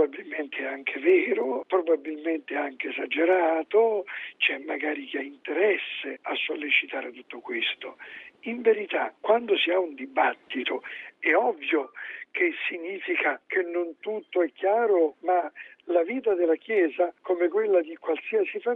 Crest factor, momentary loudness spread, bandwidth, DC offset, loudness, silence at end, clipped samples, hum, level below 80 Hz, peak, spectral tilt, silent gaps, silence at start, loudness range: 18 dB; 11 LU; 4 kHz; under 0.1%; -26 LUFS; 0 s; under 0.1%; none; -80 dBFS; -8 dBFS; -5.5 dB/octave; none; 0 s; 3 LU